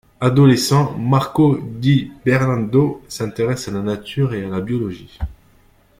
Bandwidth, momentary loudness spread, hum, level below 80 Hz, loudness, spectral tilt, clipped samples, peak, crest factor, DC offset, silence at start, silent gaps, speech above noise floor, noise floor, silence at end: 15.5 kHz; 13 LU; none; -42 dBFS; -18 LUFS; -6.5 dB/octave; under 0.1%; -2 dBFS; 16 dB; under 0.1%; 0.2 s; none; 36 dB; -53 dBFS; 0.65 s